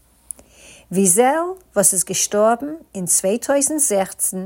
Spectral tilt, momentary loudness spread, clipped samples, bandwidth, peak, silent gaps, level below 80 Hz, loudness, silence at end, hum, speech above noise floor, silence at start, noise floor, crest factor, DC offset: -3 dB/octave; 16 LU; under 0.1%; 17 kHz; 0 dBFS; none; -58 dBFS; -17 LUFS; 0 s; none; 28 dB; 0.9 s; -46 dBFS; 18 dB; under 0.1%